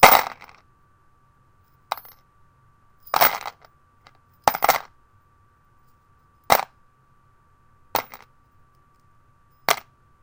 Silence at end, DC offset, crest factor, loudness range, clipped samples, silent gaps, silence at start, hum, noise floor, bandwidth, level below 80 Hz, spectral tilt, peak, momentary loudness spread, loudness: 0.45 s; under 0.1%; 26 dB; 6 LU; under 0.1%; none; 0 s; none; -59 dBFS; 17 kHz; -54 dBFS; -1.5 dB/octave; 0 dBFS; 20 LU; -22 LUFS